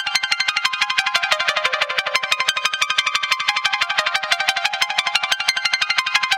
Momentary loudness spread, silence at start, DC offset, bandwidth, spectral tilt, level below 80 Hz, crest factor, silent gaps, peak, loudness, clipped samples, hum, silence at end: 2 LU; 0 s; under 0.1%; 17 kHz; 2 dB/octave; -64 dBFS; 20 dB; none; 0 dBFS; -18 LUFS; under 0.1%; none; 0 s